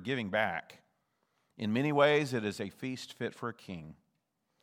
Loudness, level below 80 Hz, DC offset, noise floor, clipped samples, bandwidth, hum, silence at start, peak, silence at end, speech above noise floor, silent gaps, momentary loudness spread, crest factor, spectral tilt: -33 LUFS; -78 dBFS; under 0.1%; -80 dBFS; under 0.1%; 16 kHz; none; 0 s; -12 dBFS; 0.7 s; 48 dB; none; 15 LU; 22 dB; -5.5 dB/octave